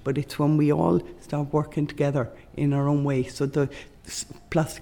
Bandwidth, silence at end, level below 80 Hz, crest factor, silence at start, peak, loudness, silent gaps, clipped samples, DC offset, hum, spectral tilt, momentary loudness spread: 19 kHz; 0 s; -50 dBFS; 16 dB; 0 s; -10 dBFS; -26 LUFS; none; under 0.1%; under 0.1%; none; -7 dB/octave; 13 LU